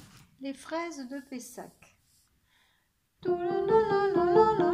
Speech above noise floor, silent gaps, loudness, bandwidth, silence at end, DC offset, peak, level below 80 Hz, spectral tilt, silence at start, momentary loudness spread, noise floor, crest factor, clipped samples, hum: 45 dB; none; -27 LUFS; 15 kHz; 0 s; under 0.1%; -10 dBFS; -62 dBFS; -6 dB/octave; 0.4 s; 20 LU; -73 dBFS; 20 dB; under 0.1%; none